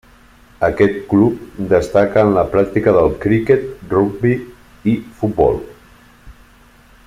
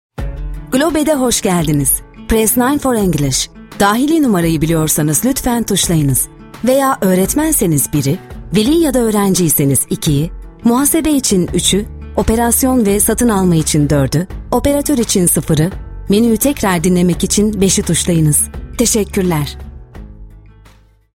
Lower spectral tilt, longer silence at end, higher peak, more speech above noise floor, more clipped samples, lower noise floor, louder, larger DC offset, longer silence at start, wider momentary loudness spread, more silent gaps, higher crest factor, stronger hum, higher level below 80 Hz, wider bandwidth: first, -8.5 dB/octave vs -4.5 dB/octave; about the same, 0.75 s vs 0.75 s; about the same, 0 dBFS vs 0 dBFS; about the same, 32 dB vs 33 dB; neither; about the same, -47 dBFS vs -45 dBFS; second, -16 LUFS vs -13 LUFS; neither; first, 0.6 s vs 0.2 s; about the same, 8 LU vs 7 LU; neither; about the same, 16 dB vs 14 dB; neither; second, -40 dBFS vs -30 dBFS; second, 14.5 kHz vs 16.5 kHz